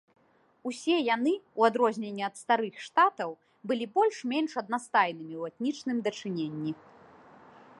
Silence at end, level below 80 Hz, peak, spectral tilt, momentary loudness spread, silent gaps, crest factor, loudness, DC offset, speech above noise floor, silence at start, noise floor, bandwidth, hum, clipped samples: 1.05 s; -82 dBFS; -8 dBFS; -5 dB/octave; 12 LU; none; 22 dB; -29 LUFS; under 0.1%; 26 dB; 0.65 s; -55 dBFS; 11.5 kHz; none; under 0.1%